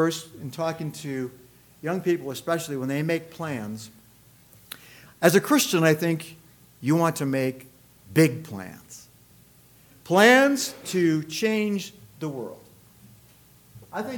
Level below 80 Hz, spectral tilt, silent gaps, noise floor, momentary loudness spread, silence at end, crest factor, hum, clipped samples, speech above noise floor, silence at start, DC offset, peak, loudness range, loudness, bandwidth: -66 dBFS; -5 dB/octave; none; -55 dBFS; 21 LU; 0 s; 22 dB; none; under 0.1%; 31 dB; 0 s; under 0.1%; -4 dBFS; 7 LU; -24 LUFS; 19 kHz